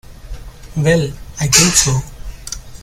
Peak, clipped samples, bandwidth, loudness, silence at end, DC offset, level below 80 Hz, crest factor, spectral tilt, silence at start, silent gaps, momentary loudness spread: 0 dBFS; under 0.1%; over 20 kHz; -13 LUFS; 0 s; under 0.1%; -32 dBFS; 18 dB; -3 dB/octave; 0.1 s; none; 25 LU